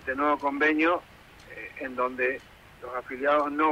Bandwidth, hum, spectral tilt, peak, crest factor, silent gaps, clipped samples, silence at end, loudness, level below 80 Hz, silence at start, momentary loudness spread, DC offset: 15.5 kHz; none; -5.5 dB/octave; -12 dBFS; 16 dB; none; under 0.1%; 0 s; -27 LUFS; -60 dBFS; 0 s; 17 LU; under 0.1%